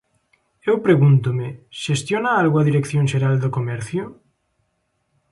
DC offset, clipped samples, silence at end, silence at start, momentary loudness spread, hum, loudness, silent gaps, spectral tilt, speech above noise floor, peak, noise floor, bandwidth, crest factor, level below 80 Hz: under 0.1%; under 0.1%; 1.2 s; 0.65 s; 13 LU; none; -19 LUFS; none; -7 dB/octave; 52 dB; -4 dBFS; -70 dBFS; 11.5 kHz; 16 dB; -58 dBFS